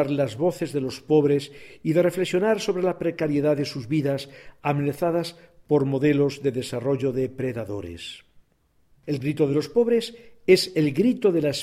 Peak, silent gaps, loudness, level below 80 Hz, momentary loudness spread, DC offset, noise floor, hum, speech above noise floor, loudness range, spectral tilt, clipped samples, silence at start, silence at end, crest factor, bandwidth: -4 dBFS; none; -24 LUFS; -58 dBFS; 12 LU; under 0.1%; -65 dBFS; none; 42 dB; 4 LU; -6.5 dB/octave; under 0.1%; 0 s; 0 s; 18 dB; 15 kHz